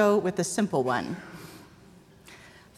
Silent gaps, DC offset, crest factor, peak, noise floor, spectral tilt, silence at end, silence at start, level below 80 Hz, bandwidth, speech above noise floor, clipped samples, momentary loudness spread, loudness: none; under 0.1%; 18 dB; -10 dBFS; -53 dBFS; -5 dB/octave; 0.4 s; 0 s; -64 dBFS; 15.5 kHz; 28 dB; under 0.1%; 24 LU; -27 LUFS